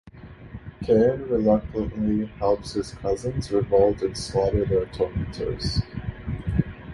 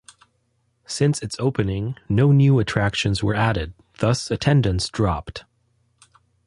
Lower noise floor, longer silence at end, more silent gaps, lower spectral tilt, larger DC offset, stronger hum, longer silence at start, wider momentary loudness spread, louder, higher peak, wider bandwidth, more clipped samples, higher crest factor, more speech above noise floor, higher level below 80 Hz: second, -43 dBFS vs -68 dBFS; second, 0 s vs 1.05 s; neither; about the same, -7 dB/octave vs -6 dB/octave; neither; neither; second, 0.05 s vs 0.9 s; about the same, 13 LU vs 12 LU; second, -24 LUFS vs -21 LUFS; about the same, -6 dBFS vs -4 dBFS; about the same, 11.5 kHz vs 11.5 kHz; neither; about the same, 18 dB vs 18 dB; second, 20 dB vs 48 dB; about the same, -38 dBFS vs -40 dBFS